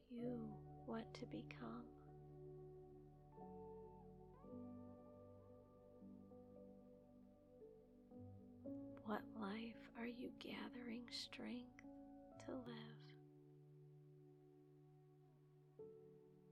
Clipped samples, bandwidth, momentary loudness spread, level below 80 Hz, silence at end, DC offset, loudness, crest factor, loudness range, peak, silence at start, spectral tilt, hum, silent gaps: under 0.1%; 12.5 kHz; 16 LU; -76 dBFS; 0 s; under 0.1%; -56 LUFS; 22 dB; 12 LU; -34 dBFS; 0 s; -6 dB/octave; none; none